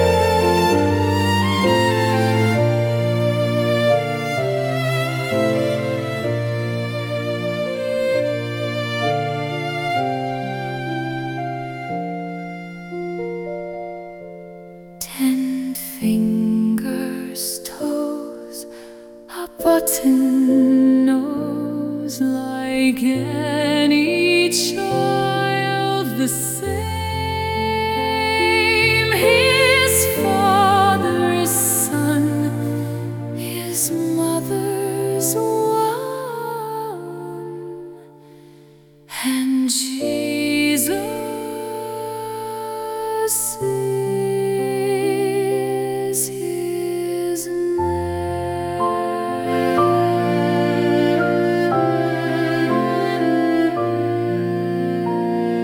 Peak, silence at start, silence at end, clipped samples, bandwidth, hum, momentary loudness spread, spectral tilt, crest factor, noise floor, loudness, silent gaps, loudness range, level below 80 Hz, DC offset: -2 dBFS; 0 s; 0 s; under 0.1%; 18 kHz; none; 12 LU; -4.5 dB/octave; 18 dB; -48 dBFS; -19 LUFS; none; 9 LU; -48 dBFS; under 0.1%